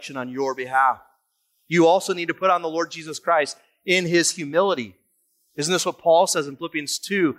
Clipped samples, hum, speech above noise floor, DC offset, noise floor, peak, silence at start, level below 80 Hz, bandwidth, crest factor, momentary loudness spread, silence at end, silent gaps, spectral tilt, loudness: under 0.1%; none; 49 dB; under 0.1%; -70 dBFS; -6 dBFS; 0 s; -72 dBFS; 15.5 kHz; 16 dB; 11 LU; 0.05 s; none; -3.5 dB/octave; -21 LUFS